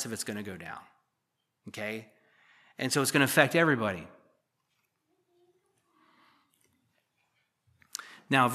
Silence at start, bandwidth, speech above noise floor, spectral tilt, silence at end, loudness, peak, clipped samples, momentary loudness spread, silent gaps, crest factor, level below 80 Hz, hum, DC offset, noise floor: 0 s; 15 kHz; 53 dB; -4 dB/octave; 0 s; -28 LUFS; -6 dBFS; under 0.1%; 20 LU; none; 28 dB; -76 dBFS; none; under 0.1%; -82 dBFS